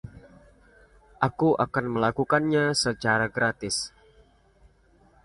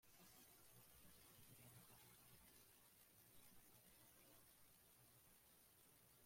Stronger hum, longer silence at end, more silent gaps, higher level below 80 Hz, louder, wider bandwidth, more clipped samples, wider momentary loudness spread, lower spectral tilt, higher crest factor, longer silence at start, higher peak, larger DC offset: neither; first, 1.35 s vs 0 s; neither; first, -56 dBFS vs -86 dBFS; first, -25 LUFS vs -68 LUFS; second, 11.5 kHz vs 16.5 kHz; neither; about the same, 6 LU vs 4 LU; first, -4.5 dB/octave vs -2.5 dB/octave; first, 22 dB vs 16 dB; about the same, 0.05 s vs 0 s; first, -6 dBFS vs -54 dBFS; neither